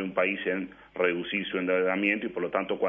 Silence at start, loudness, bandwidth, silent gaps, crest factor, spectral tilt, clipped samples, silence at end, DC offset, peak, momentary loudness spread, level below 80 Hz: 0 s; -28 LUFS; 3.8 kHz; none; 18 dB; -8 dB/octave; under 0.1%; 0 s; under 0.1%; -10 dBFS; 5 LU; -66 dBFS